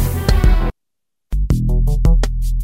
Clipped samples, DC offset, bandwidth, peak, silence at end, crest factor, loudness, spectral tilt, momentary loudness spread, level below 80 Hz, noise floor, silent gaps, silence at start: under 0.1%; under 0.1%; 16 kHz; 0 dBFS; 0 s; 14 dB; -18 LUFS; -6.5 dB/octave; 9 LU; -16 dBFS; -83 dBFS; none; 0 s